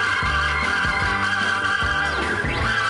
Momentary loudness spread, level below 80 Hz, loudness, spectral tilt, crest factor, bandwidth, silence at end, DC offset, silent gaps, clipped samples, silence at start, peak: 2 LU; -34 dBFS; -20 LUFS; -3.5 dB/octave; 12 dB; 11.5 kHz; 0 s; under 0.1%; none; under 0.1%; 0 s; -10 dBFS